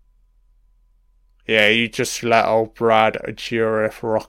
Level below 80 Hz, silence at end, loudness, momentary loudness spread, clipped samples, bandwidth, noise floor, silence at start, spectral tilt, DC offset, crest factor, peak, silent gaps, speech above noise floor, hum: -52 dBFS; 0.05 s; -18 LUFS; 8 LU; under 0.1%; 16.5 kHz; -57 dBFS; 1.5 s; -4 dB/octave; under 0.1%; 20 dB; 0 dBFS; none; 39 dB; none